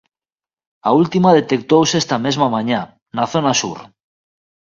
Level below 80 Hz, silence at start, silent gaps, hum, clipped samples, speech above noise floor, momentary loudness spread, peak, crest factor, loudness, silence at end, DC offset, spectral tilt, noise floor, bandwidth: -58 dBFS; 0.85 s; 3.02-3.06 s; none; under 0.1%; over 75 dB; 10 LU; 0 dBFS; 18 dB; -16 LUFS; 0.85 s; under 0.1%; -5 dB/octave; under -90 dBFS; 7.6 kHz